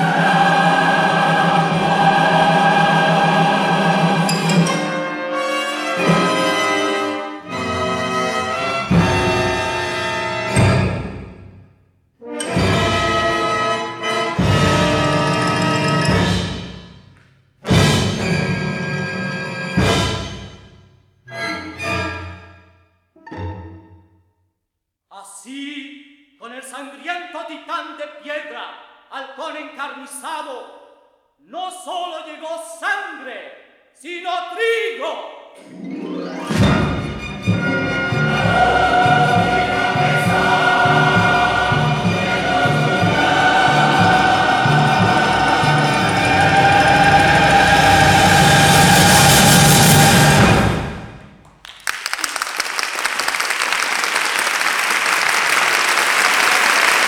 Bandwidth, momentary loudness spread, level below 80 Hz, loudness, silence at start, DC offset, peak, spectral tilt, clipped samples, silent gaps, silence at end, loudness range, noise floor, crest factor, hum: 19.5 kHz; 19 LU; -38 dBFS; -15 LUFS; 0 s; under 0.1%; 0 dBFS; -4 dB/octave; under 0.1%; none; 0 s; 18 LU; -77 dBFS; 16 dB; none